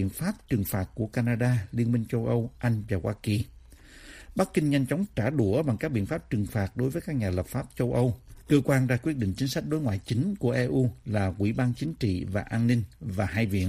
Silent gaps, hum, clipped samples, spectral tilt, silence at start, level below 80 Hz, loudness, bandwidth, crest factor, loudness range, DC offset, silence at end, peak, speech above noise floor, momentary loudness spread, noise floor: none; none; under 0.1%; -7 dB/octave; 0 s; -50 dBFS; -28 LUFS; 15.5 kHz; 18 dB; 2 LU; under 0.1%; 0 s; -10 dBFS; 23 dB; 6 LU; -50 dBFS